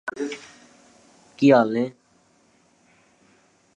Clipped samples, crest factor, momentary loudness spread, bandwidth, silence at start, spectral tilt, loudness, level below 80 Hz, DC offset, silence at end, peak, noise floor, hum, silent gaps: under 0.1%; 22 dB; 15 LU; 9.2 kHz; 0.05 s; -6.5 dB/octave; -21 LUFS; -74 dBFS; under 0.1%; 1.85 s; -2 dBFS; -61 dBFS; none; none